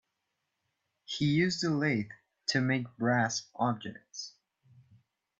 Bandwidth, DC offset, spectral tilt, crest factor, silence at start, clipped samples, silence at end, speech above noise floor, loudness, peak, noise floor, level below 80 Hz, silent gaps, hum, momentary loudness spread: 8 kHz; under 0.1%; -5 dB/octave; 18 dB; 1.1 s; under 0.1%; 1.1 s; 53 dB; -31 LUFS; -14 dBFS; -83 dBFS; -72 dBFS; none; none; 15 LU